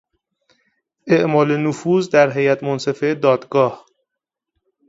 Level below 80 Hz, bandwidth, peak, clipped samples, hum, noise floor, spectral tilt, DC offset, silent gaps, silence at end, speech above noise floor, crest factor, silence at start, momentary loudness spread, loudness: -64 dBFS; 7.8 kHz; 0 dBFS; under 0.1%; none; -83 dBFS; -6.5 dB/octave; under 0.1%; none; 1.1 s; 66 dB; 18 dB; 1.05 s; 6 LU; -17 LUFS